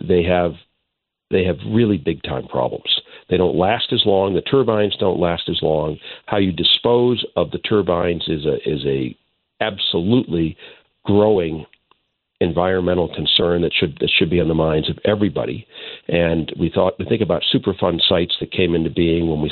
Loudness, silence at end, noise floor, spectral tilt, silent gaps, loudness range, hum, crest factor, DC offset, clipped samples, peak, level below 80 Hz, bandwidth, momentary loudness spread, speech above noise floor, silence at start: -18 LUFS; 0 s; -78 dBFS; -10 dB/octave; none; 3 LU; none; 16 dB; under 0.1%; under 0.1%; -2 dBFS; -42 dBFS; 4.5 kHz; 8 LU; 60 dB; 0 s